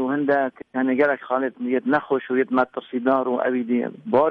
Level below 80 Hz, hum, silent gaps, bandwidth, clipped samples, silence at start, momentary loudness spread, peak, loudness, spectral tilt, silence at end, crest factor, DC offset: -68 dBFS; none; none; 4.7 kHz; under 0.1%; 0 s; 5 LU; -6 dBFS; -22 LUFS; -8.5 dB/octave; 0 s; 16 dB; under 0.1%